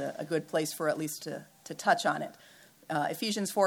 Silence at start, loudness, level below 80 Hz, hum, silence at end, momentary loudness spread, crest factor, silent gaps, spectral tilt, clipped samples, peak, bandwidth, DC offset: 0 s; -32 LUFS; -82 dBFS; none; 0 s; 14 LU; 20 dB; none; -3.5 dB/octave; under 0.1%; -12 dBFS; 19.5 kHz; under 0.1%